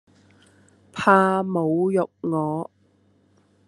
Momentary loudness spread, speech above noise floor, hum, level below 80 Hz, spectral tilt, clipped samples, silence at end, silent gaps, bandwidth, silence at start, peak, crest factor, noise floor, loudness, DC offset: 14 LU; 40 dB; 50 Hz at -55 dBFS; -70 dBFS; -7 dB/octave; under 0.1%; 1.05 s; none; 11.5 kHz; 0.95 s; -2 dBFS; 22 dB; -61 dBFS; -22 LUFS; under 0.1%